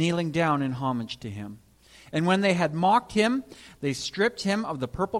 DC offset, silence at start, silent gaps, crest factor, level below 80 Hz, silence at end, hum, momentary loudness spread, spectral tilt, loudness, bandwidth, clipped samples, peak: under 0.1%; 0 s; none; 18 dB; -56 dBFS; 0 s; none; 13 LU; -5.5 dB/octave; -26 LUFS; 13 kHz; under 0.1%; -10 dBFS